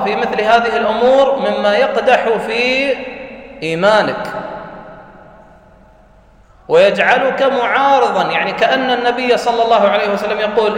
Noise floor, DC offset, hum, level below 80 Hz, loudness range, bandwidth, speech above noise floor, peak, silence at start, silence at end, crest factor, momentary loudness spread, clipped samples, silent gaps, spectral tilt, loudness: -45 dBFS; under 0.1%; none; -50 dBFS; 7 LU; 10.5 kHz; 32 dB; 0 dBFS; 0 s; 0 s; 14 dB; 13 LU; under 0.1%; none; -4.5 dB/octave; -13 LUFS